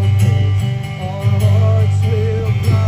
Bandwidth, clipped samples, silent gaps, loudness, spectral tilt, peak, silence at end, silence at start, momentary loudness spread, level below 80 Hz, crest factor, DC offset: 15.5 kHz; under 0.1%; none; -15 LUFS; -7.5 dB/octave; -2 dBFS; 0 s; 0 s; 7 LU; -38 dBFS; 10 dB; under 0.1%